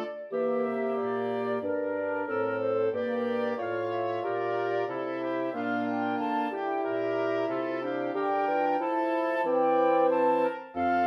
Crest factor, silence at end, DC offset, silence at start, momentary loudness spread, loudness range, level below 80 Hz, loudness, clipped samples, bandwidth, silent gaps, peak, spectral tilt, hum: 14 dB; 0 s; under 0.1%; 0 s; 7 LU; 3 LU; -76 dBFS; -29 LUFS; under 0.1%; 6.4 kHz; none; -14 dBFS; -7.5 dB/octave; none